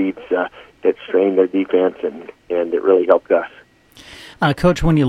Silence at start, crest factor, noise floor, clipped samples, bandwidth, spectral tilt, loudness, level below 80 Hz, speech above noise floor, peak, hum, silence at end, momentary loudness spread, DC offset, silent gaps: 0 s; 18 dB; -45 dBFS; under 0.1%; 13 kHz; -7.5 dB/octave; -18 LUFS; -36 dBFS; 29 dB; 0 dBFS; none; 0 s; 12 LU; under 0.1%; none